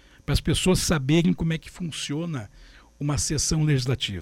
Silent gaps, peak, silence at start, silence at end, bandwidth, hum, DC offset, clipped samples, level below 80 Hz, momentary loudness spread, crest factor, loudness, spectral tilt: none; -10 dBFS; 0.3 s; 0 s; 16.5 kHz; none; under 0.1%; under 0.1%; -38 dBFS; 11 LU; 14 dB; -24 LUFS; -4.5 dB/octave